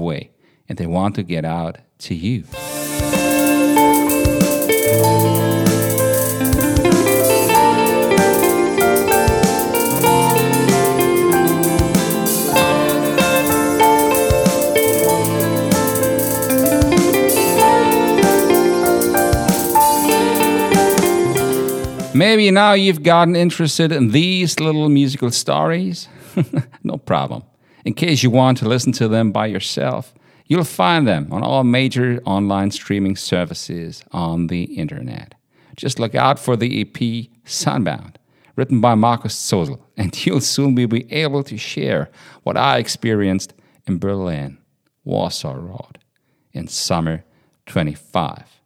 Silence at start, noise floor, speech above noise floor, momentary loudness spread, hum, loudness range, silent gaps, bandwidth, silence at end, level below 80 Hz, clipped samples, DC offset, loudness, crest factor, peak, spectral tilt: 0 s; -64 dBFS; 47 dB; 12 LU; none; 8 LU; none; over 20 kHz; 0.25 s; -38 dBFS; under 0.1%; under 0.1%; -16 LUFS; 16 dB; 0 dBFS; -4.5 dB/octave